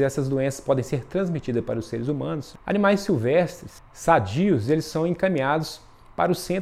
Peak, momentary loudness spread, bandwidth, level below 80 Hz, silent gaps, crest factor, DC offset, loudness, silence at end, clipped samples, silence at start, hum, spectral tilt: -4 dBFS; 10 LU; 15 kHz; -50 dBFS; none; 20 dB; under 0.1%; -24 LUFS; 0 s; under 0.1%; 0 s; none; -6.5 dB/octave